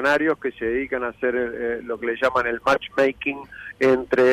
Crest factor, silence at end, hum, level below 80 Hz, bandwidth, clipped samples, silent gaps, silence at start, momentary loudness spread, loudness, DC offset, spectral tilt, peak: 14 dB; 0 s; none; -52 dBFS; 12.5 kHz; under 0.1%; none; 0 s; 8 LU; -23 LUFS; under 0.1%; -5.5 dB/octave; -8 dBFS